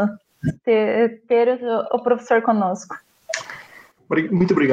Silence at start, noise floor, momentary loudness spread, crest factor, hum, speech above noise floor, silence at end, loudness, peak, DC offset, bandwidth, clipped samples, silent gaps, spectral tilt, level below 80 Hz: 0 s; -46 dBFS; 13 LU; 16 dB; none; 28 dB; 0 s; -20 LUFS; -4 dBFS; under 0.1%; 9.2 kHz; under 0.1%; none; -6.5 dB/octave; -56 dBFS